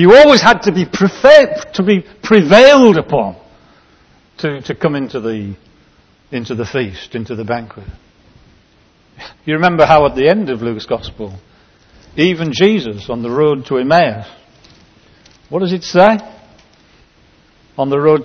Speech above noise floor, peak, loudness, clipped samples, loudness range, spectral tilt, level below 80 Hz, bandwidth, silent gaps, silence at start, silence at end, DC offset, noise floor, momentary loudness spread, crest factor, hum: 39 dB; 0 dBFS; -12 LUFS; 0.8%; 14 LU; -5.5 dB/octave; -44 dBFS; 8 kHz; none; 0 s; 0 s; under 0.1%; -51 dBFS; 18 LU; 14 dB; none